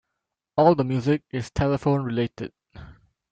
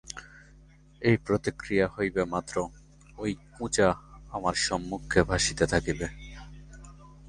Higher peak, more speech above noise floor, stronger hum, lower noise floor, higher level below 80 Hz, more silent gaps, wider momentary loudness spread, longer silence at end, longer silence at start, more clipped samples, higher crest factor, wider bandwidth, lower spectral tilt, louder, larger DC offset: about the same, -4 dBFS vs -6 dBFS; first, 60 dB vs 27 dB; neither; first, -83 dBFS vs -55 dBFS; about the same, -48 dBFS vs -46 dBFS; neither; second, 11 LU vs 20 LU; first, 0.4 s vs 0 s; first, 0.55 s vs 0.05 s; neither; about the same, 20 dB vs 24 dB; second, 8.8 kHz vs 11.5 kHz; first, -8 dB/octave vs -4.5 dB/octave; first, -23 LUFS vs -28 LUFS; neither